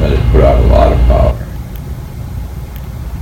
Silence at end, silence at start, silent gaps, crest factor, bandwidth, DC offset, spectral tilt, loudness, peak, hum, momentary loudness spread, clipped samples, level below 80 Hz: 0 s; 0 s; none; 10 dB; 15.5 kHz; under 0.1%; -8 dB/octave; -10 LUFS; 0 dBFS; none; 16 LU; 0.9%; -14 dBFS